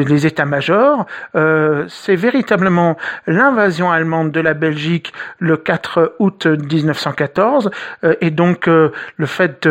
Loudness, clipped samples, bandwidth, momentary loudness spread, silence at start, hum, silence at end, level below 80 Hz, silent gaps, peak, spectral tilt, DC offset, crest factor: -15 LUFS; under 0.1%; 13.5 kHz; 7 LU; 0 s; none; 0 s; -56 dBFS; none; 0 dBFS; -7 dB/octave; under 0.1%; 14 dB